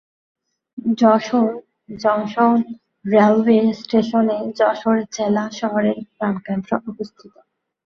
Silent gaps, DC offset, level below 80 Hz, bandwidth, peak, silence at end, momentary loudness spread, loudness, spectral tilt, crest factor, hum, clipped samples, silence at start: none; under 0.1%; -62 dBFS; 6.8 kHz; -2 dBFS; 0.85 s; 16 LU; -18 LUFS; -6.5 dB/octave; 18 dB; none; under 0.1%; 0.75 s